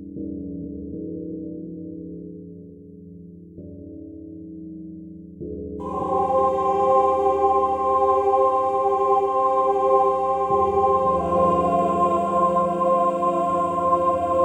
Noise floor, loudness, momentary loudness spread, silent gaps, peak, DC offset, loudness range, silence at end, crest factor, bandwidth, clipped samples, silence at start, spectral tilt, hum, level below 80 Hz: -42 dBFS; -20 LUFS; 20 LU; none; -6 dBFS; under 0.1%; 19 LU; 0 s; 16 dB; 9.6 kHz; under 0.1%; 0 s; -8 dB/octave; none; -48 dBFS